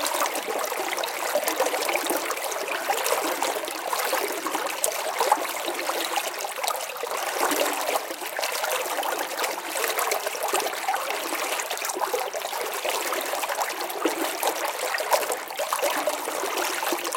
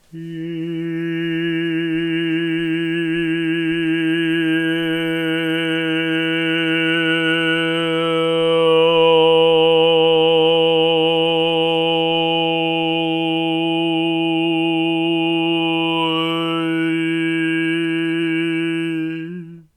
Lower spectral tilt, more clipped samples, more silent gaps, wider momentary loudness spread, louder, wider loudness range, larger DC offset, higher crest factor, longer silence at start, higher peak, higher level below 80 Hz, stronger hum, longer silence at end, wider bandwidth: second, 0.5 dB/octave vs -6 dB/octave; neither; neither; second, 4 LU vs 8 LU; second, -26 LUFS vs -17 LUFS; second, 1 LU vs 6 LU; neither; first, 28 dB vs 14 dB; second, 0 s vs 0.15 s; first, 0 dBFS vs -4 dBFS; second, -78 dBFS vs -60 dBFS; neither; second, 0 s vs 0.15 s; first, 17 kHz vs 10 kHz